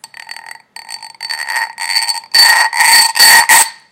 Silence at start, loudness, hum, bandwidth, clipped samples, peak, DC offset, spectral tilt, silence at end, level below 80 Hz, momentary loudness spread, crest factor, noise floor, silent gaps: 0.3 s; -7 LUFS; none; over 20 kHz; 0.6%; 0 dBFS; under 0.1%; 3.5 dB/octave; 0.2 s; -60 dBFS; 24 LU; 12 dB; -33 dBFS; none